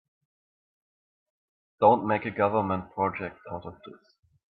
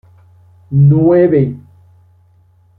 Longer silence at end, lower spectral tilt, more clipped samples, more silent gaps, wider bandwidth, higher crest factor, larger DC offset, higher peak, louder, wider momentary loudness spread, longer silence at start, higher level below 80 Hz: second, 0.6 s vs 1.2 s; second, -10 dB/octave vs -13.5 dB/octave; neither; neither; first, 5.4 kHz vs 2.8 kHz; first, 24 dB vs 12 dB; neither; second, -6 dBFS vs -2 dBFS; second, -26 LUFS vs -11 LUFS; first, 17 LU vs 10 LU; first, 1.8 s vs 0.7 s; second, -66 dBFS vs -46 dBFS